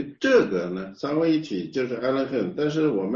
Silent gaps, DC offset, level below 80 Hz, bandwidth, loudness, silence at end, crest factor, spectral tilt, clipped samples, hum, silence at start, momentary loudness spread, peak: none; under 0.1%; -62 dBFS; 7.4 kHz; -24 LUFS; 0 s; 18 dB; -6.5 dB/octave; under 0.1%; none; 0 s; 8 LU; -6 dBFS